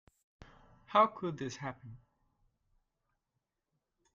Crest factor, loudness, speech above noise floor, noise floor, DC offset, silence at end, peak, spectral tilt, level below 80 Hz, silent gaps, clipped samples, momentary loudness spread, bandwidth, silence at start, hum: 24 dB; -33 LUFS; 53 dB; -86 dBFS; under 0.1%; 2.2 s; -14 dBFS; -5.5 dB/octave; -70 dBFS; none; under 0.1%; 22 LU; 7.6 kHz; 0.9 s; none